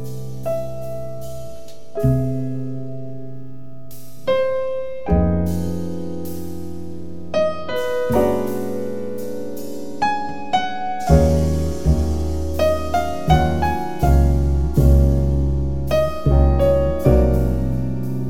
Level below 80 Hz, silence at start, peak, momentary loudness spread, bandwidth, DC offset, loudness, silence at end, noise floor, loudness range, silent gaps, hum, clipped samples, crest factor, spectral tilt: -24 dBFS; 0 s; 0 dBFS; 17 LU; 16 kHz; 5%; -20 LUFS; 0 s; -40 dBFS; 7 LU; none; none; under 0.1%; 20 dB; -7.5 dB/octave